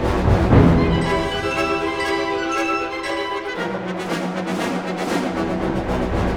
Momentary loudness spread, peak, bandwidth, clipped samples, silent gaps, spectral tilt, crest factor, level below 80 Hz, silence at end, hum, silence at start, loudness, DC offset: 10 LU; 0 dBFS; 16 kHz; under 0.1%; none; -6.5 dB/octave; 18 dB; -30 dBFS; 0 s; none; 0 s; -20 LUFS; under 0.1%